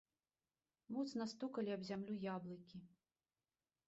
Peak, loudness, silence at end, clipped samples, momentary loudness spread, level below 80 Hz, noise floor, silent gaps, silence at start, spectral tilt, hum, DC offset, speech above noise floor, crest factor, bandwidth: -34 dBFS; -47 LUFS; 1 s; under 0.1%; 12 LU; -86 dBFS; under -90 dBFS; none; 0.9 s; -5.5 dB/octave; none; under 0.1%; over 44 dB; 16 dB; 7.6 kHz